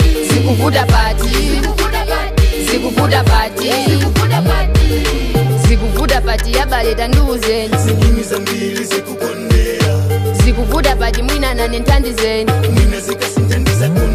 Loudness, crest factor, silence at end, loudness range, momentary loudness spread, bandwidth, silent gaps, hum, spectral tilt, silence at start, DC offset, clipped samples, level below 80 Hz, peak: -14 LUFS; 12 dB; 0 s; 2 LU; 4 LU; 15.5 kHz; none; none; -5 dB/octave; 0 s; under 0.1%; under 0.1%; -16 dBFS; 0 dBFS